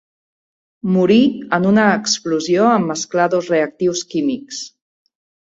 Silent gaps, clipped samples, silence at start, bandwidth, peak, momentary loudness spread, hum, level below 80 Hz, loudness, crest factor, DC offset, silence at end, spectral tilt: none; under 0.1%; 0.85 s; 8 kHz; -2 dBFS; 12 LU; none; -60 dBFS; -16 LUFS; 16 dB; under 0.1%; 0.9 s; -4.5 dB/octave